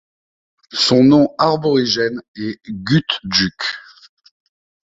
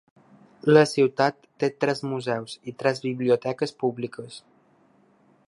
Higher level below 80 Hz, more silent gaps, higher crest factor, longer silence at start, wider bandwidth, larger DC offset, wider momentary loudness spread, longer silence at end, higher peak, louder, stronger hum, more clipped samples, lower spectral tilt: first, -52 dBFS vs -74 dBFS; first, 2.28-2.34 s vs none; second, 16 dB vs 22 dB; about the same, 0.75 s vs 0.65 s; second, 8 kHz vs 11.5 kHz; neither; about the same, 15 LU vs 16 LU; about the same, 1.1 s vs 1.1 s; about the same, -2 dBFS vs -2 dBFS; first, -16 LUFS vs -24 LUFS; neither; neither; about the same, -5 dB/octave vs -6 dB/octave